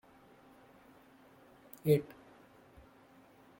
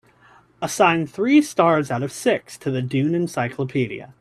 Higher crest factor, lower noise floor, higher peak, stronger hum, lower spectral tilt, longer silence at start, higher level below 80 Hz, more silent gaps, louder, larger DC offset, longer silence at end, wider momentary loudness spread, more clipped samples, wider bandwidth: first, 24 dB vs 18 dB; first, -62 dBFS vs -53 dBFS; second, -16 dBFS vs -2 dBFS; neither; first, -7.5 dB/octave vs -5.5 dB/octave; first, 1.85 s vs 0.6 s; second, -72 dBFS vs -62 dBFS; neither; second, -33 LUFS vs -21 LUFS; neither; first, 1.55 s vs 0.1 s; first, 29 LU vs 9 LU; neither; first, 16.5 kHz vs 13.5 kHz